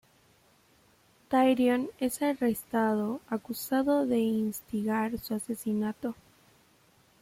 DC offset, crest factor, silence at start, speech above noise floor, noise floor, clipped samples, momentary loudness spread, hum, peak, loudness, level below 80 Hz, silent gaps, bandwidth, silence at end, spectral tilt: under 0.1%; 16 dB; 1.3 s; 35 dB; -64 dBFS; under 0.1%; 9 LU; none; -14 dBFS; -29 LUFS; -66 dBFS; none; 16.5 kHz; 1.1 s; -5.5 dB/octave